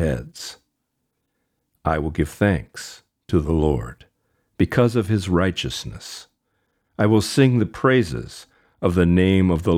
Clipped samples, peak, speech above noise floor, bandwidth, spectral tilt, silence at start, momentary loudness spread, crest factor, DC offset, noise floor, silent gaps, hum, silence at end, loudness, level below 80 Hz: under 0.1%; -4 dBFS; 56 dB; 15.5 kHz; -6.5 dB/octave; 0 s; 18 LU; 18 dB; under 0.1%; -75 dBFS; none; none; 0 s; -20 LUFS; -38 dBFS